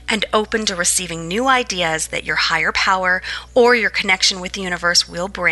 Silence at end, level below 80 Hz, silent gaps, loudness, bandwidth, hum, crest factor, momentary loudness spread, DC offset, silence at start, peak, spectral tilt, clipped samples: 0 s; -42 dBFS; none; -17 LUFS; 12 kHz; none; 16 dB; 7 LU; under 0.1%; 0 s; -2 dBFS; -1.5 dB/octave; under 0.1%